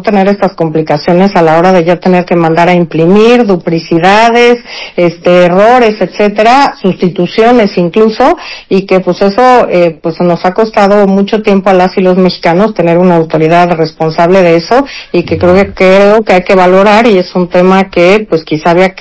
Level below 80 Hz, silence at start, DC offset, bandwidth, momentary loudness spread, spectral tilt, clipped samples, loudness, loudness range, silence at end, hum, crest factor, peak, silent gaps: -38 dBFS; 0 s; under 0.1%; 8 kHz; 6 LU; -7 dB/octave; 10%; -7 LUFS; 2 LU; 0 s; none; 6 dB; 0 dBFS; none